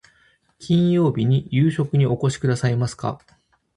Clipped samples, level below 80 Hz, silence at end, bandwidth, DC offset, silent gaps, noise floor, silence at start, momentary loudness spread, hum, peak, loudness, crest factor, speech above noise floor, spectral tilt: under 0.1%; -52 dBFS; 0.6 s; 11 kHz; under 0.1%; none; -60 dBFS; 0.6 s; 11 LU; none; -8 dBFS; -20 LUFS; 14 dB; 40 dB; -7.5 dB/octave